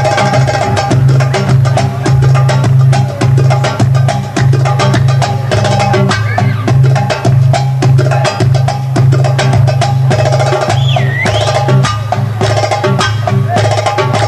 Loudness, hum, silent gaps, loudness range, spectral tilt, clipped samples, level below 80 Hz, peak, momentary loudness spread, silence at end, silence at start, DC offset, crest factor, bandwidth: -10 LUFS; none; none; 1 LU; -6 dB/octave; under 0.1%; -32 dBFS; 0 dBFS; 3 LU; 0 s; 0 s; under 0.1%; 8 dB; 11 kHz